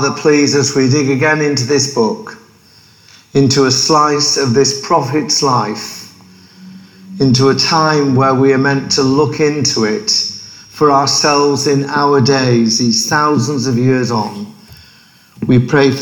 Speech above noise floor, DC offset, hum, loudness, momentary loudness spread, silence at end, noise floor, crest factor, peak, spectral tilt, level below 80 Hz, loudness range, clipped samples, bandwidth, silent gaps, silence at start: 33 dB; under 0.1%; none; -12 LUFS; 9 LU; 0 s; -45 dBFS; 14 dB; 0 dBFS; -4.5 dB/octave; -50 dBFS; 3 LU; under 0.1%; 19 kHz; none; 0 s